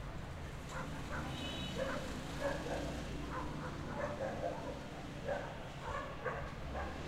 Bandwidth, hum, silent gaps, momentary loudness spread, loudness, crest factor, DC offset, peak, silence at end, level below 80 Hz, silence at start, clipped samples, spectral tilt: 16 kHz; none; none; 6 LU; -43 LUFS; 16 dB; under 0.1%; -26 dBFS; 0 s; -50 dBFS; 0 s; under 0.1%; -5.5 dB/octave